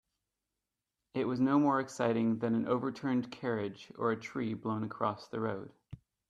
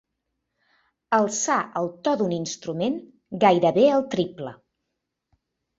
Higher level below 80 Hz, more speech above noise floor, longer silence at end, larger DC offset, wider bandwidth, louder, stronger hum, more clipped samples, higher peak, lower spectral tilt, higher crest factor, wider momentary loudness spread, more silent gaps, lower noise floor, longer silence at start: second, -72 dBFS vs -66 dBFS; about the same, 56 dB vs 59 dB; second, 0.35 s vs 1.25 s; neither; first, 9.8 kHz vs 8 kHz; second, -34 LUFS vs -23 LUFS; neither; neither; second, -16 dBFS vs -4 dBFS; first, -7 dB/octave vs -4.5 dB/octave; about the same, 18 dB vs 22 dB; second, 9 LU vs 13 LU; neither; first, -89 dBFS vs -81 dBFS; about the same, 1.15 s vs 1.1 s